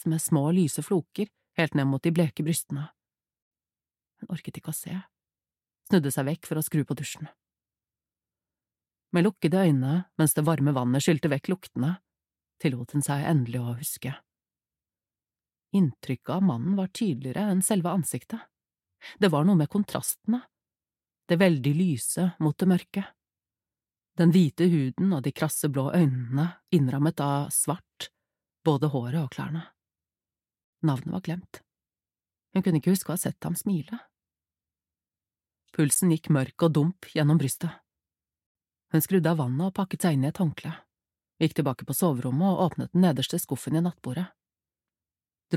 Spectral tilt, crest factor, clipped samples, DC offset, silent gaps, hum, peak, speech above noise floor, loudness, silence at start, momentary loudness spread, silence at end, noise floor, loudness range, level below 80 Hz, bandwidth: -6 dB/octave; 20 dB; under 0.1%; under 0.1%; 3.42-3.51 s, 30.64-30.73 s, 38.46-38.55 s; none; -8 dBFS; over 64 dB; -26 LUFS; 0.05 s; 12 LU; 0 s; under -90 dBFS; 6 LU; -68 dBFS; 16 kHz